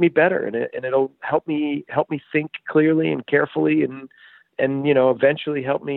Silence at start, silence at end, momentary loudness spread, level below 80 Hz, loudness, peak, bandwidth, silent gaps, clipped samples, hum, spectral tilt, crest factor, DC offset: 0 s; 0 s; 7 LU; -68 dBFS; -21 LUFS; -4 dBFS; 4.1 kHz; none; under 0.1%; none; -10.5 dB/octave; 16 dB; under 0.1%